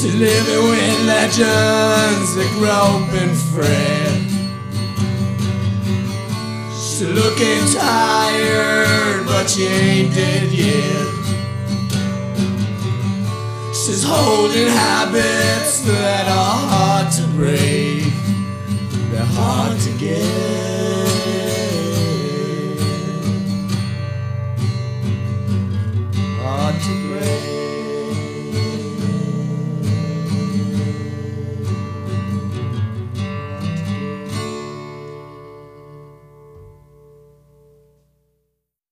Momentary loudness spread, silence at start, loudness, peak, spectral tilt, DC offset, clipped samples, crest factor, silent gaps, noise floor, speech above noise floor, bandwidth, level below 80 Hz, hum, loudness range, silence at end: 10 LU; 0 s; -18 LUFS; 0 dBFS; -4.5 dB/octave; under 0.1%; under 0.1%; 16 dB; none; -73 dBFS; 57 dB; 15.5 kHz; -48 dBFS; none; 9 LU; 2.2 s